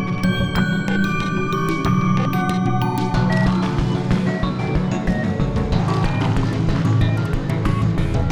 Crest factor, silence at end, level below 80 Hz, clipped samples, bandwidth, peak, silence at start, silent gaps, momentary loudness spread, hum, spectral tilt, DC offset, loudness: 12 dB; 0 s; -30 dBFS; under 0.1%; over 20 kHz; -6 dBFS; 0 s; none; 3 LU; none; -7 dB/octave; under 0.1%; -20 LUFS